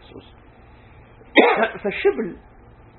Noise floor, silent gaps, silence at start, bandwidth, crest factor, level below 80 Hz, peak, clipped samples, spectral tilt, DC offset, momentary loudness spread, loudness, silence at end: -47 dBFS; none; 0.15 s; 4.3 kHz; 22 dB; -52 dBFS; 0 dBFS; under 0.1%; -7 dB/octave; under 0.1%; 13 LU; -19 LUFS; 0.6 s